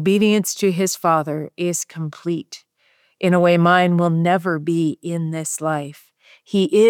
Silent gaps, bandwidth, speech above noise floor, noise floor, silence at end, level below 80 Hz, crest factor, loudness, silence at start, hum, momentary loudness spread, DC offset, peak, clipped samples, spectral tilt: none; 18.5 kHz; 43 dB; -61 dBFS; 0 s; -72 dBFS; 16 dB; -19 LUFS; 0 s; none; 12 LU; under 0.1%; -2 dBFS; under 0.1%; -5.5 dB/octave